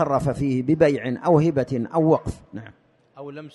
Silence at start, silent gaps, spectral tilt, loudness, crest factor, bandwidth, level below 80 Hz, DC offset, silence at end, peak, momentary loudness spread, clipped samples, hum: 0 s; none; -8.5 dB/octave; -21 LUFS; 18 dB; 11.5 kHz; -48 dBFS; under 0.1%; 0.05 s; -4 dBFS; 20 LU; under 0.1%; none